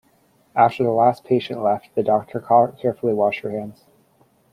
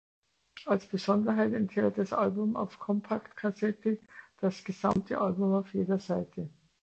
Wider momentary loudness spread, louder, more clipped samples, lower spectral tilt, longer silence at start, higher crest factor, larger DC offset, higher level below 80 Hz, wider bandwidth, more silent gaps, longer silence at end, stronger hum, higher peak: first, 10 LU vs 7 LU; first, -20 LUFS vs -31 LUFS; neither; about the same, -8 dB/octave vs -8 dB/octave; about the same, 0.55 s vs 0.55 s; about the same, 18 dB vs 18 dB; neither; about the same, -64 dBFS vs -66 dBFS; first, 13.5 kHz vs 8 kHz; neither; first, 0.8 s vs 0.35 s; neither; first, -2 dBFS vs -14 dBFS